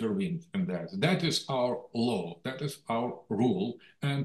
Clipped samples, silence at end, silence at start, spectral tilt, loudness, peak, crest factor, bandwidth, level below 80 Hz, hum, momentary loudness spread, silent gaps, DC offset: under 0.1%; 0 s; 0 s; -6 dB/octave; -31 LUFS; -12 dBFS; 20 dB; 12.5 kHz; -72 dBFS; none; 8 LU; none; under 0.1%